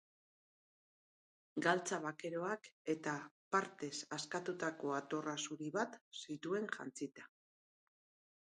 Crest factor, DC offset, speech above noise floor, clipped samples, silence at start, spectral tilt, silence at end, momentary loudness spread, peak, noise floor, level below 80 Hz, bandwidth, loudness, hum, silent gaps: 24 dB; under 0.1%; over 48 dB; under 0.1%; 1.55 s; -4 dB/octave; 1.2 s; 10 LU; -20 dBFS; under -90 dBFS; under -90 dBFS; 11.5 kHz; -42 LUFS; none; 2.72-2.85 s, 3.31-3.51 s, 6.01-6.11 s